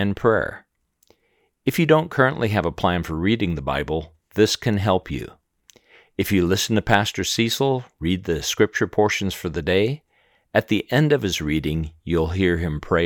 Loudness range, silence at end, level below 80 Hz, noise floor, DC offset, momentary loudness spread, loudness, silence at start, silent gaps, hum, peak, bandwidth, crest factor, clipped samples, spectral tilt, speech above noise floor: 2 LU; 0 s; -44 dBFS; -67 dBFS; under 0.1%; 9 LU; -22 LUFS; 0 s; none; none; 0 dBFS; 19.5 kHz; 22 dB; under 0.1%; -5 dB/octave; 46 dB